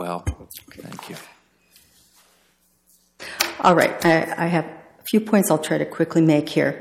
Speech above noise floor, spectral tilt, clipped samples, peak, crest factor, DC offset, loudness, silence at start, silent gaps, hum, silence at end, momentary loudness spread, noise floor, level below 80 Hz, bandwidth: 42 dB; -5 dB/octave; under 0.1%; 0 dBFS; 22 dB; under 0.1%; -20 LUFS; 0 s; none; none; 0 s; 21 LU; -62 dBFS; -46 dBFS; 17 kHz